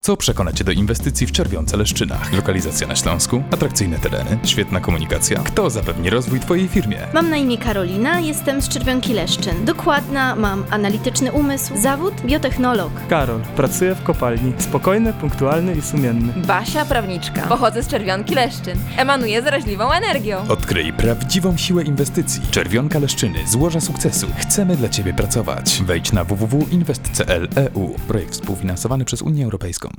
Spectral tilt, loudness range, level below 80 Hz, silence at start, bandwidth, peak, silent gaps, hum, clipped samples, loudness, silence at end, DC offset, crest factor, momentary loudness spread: -4.5 dB/octave; 1 LU; -30 dBFS; 0.05 s; over 20 kHz; -4 dBFS; none; none; under 0.1%; -18 LUFS; 0 s; under 0.1%; 14 dB; 4 LU